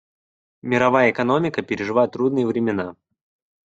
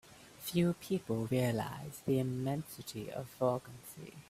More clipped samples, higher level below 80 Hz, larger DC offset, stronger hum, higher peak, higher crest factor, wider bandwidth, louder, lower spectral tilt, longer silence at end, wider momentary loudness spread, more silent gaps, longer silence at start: neither; first, -60 dBFS vs -66 dBFS; neither; neither; first, -2 dBFS vs -18 dBFS; about the same, 18 dB vs 18 dB; second, 7.8 kHz vs 16 kHz; first, -20 LUFS vs -36 LUFS; about the same, -7 dB/octave vs -6.5 dB/octave; first, 0.75 s vs 0.05 s; second, 9 LU vs 13 LU; neither; first, 0.65 s vs 0.05 s